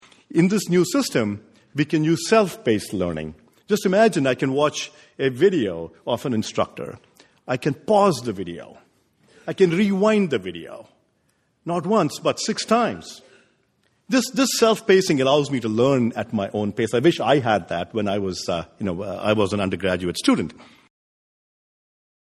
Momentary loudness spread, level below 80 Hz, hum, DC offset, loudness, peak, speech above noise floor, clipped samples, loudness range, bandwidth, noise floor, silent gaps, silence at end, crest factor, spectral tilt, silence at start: 14 LU; -58 dBFS; none; under 0.1%; -21 LUFS; -4 dBFS; 46 dB; under 0.1%; 5 LU; 13.5 kHz; -67 dBFS; none; 1.7 s; 18 dB; -5 dB/octave; 0.3 s